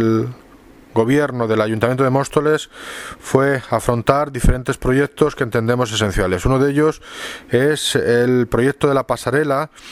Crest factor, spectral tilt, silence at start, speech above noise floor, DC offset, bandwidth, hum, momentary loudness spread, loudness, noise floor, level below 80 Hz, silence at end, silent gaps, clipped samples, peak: 18 dB; -5.5 dB/octave; 0 s; 27 dB; under 0.1%; 16 kHz; none; 6 LU; -17 LUFS; -44 dBFS; -30 dBFS; 0 s; none; under 0.1%; 0 dBFS